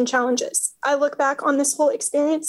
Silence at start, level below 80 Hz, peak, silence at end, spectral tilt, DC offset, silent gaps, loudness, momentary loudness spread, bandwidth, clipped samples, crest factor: 0 s; -80 dBFS; -8 dBFS; 0 s; -1 dB/octave; under 0.1%; none; -21 LUFS; 2 LU; 13.5 kHz; under 0.1%; 14 dB